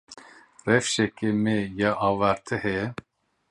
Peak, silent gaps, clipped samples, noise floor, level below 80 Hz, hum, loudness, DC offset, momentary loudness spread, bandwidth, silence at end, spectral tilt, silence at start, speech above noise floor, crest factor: -4 dBFS; none; under 0.1%; -50 dBFS; -56 dBFS; none; -25 LUFS; under 0.1%; 9 LU; 11 kHz; 0.6 s; -5 dB/octave; 0.1 s; 25 dB; 22 dB